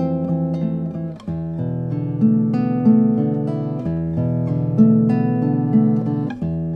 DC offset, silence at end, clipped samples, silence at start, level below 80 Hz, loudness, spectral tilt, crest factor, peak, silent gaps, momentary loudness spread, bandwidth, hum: under 0.1%; 0 s; under 0.1%; 0 s; -46 dBFS; -19 LUFS; -11.5 dB/octave; 16 dB; -2 dBFS; none; 10 LU; 4.8 kHz; none